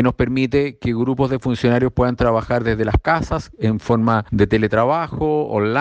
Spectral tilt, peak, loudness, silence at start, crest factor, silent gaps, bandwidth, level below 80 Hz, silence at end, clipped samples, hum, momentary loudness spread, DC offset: -8 dB/octave; -4 dBFS; -18 LUFS; 0 s; 14 dB; none; 8.4 kHz; -34 dBFS; 0 s; under 0.1%; none; 4 LU; under 0.1%